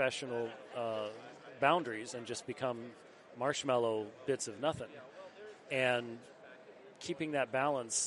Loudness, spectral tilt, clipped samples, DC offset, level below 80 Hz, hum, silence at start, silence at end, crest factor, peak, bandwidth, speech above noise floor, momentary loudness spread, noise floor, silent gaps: -36 LUFS; -3 dB/octave; under 0.1%; under 0.1%; -78 dBFS; none; 0 s; 0 s; 24 dB; -14 dBFS; 11.5 kHz; 20 dB; 20 LU; -56 dBFS; none